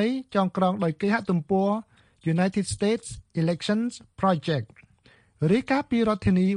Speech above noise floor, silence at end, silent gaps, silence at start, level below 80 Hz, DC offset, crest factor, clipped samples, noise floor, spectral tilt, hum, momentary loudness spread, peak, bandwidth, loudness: 34 dB; 0 s; none; 0 s; -52 dBFS; under 0.1%; 16 dB; under 0.1%; -59 dBFS; -6.5 dB/octave; none; 7 LU; -10 dBFS; 10.5 kHz; -26 LUFS